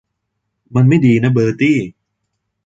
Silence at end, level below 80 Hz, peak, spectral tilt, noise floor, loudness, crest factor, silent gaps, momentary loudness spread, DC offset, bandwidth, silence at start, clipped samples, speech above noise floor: 0.75 s; -50 dBFS; -2 dBFS; -8 dB/octave; -73 dBFS; -13 LUFS; 14 dB; none; 9 LU; under 0.1%; 7.8 kHz; 0.7 s; under 0.1%; 61 dB